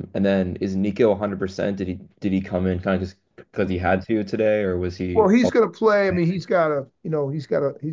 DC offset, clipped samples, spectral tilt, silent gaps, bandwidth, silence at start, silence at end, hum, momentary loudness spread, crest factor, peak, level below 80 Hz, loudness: under 0.1%; under 0.1%; -7.5 dB/octave; none; 7.6 kHz; 0 s; 0 s; none; 9 LU; 16 dB; -4 dBFS; -44 dBFS; -22 LUFS